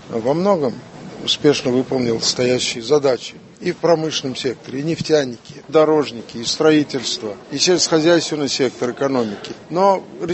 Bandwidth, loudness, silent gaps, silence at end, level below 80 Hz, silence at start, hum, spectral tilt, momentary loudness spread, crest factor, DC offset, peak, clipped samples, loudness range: 8.6 kHz; -18 LUFS; none; 0 s; -56 dBFS; 0 s; none; -4 dB/octave; 11 LU; 18 dB; under 0.1%; 0 dBFS; under 0.1%; 2 LU